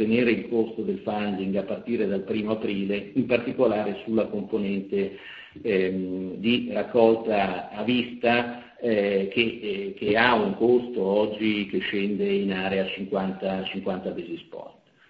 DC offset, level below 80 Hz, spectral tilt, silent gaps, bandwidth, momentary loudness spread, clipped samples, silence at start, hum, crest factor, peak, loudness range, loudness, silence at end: under 0.1%; -60 dBFS; -8.5 dB/octave; none; 5.2 kHz; 10 LU; under 0.1%; 0 s; none; 22 dB; -4 dBFS; 4 LU; -25 LUFS; 0.4 s